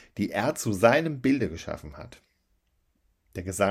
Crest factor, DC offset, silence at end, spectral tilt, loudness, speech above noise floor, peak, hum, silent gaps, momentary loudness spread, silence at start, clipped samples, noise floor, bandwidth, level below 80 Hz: 24 dB; under 0.1%; 0 s; -5.5 dB/octave; -26 LUFS; 45 dB; -4 dBFS; none; none; 20 LU; 0.15 s; under 0.1%; -71 dBFS; 16 kHz; -56 dBFS